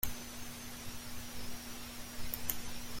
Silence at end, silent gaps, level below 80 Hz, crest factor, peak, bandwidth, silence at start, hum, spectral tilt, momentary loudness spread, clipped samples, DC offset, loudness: 0 s; none; -52 dBFS; 28 dB; -12 dBFS; 16.5 kHz; 0 s; none; -2.5 dB/octave; 7 LU; under 0.1%; under 0.1%; -43 LUFS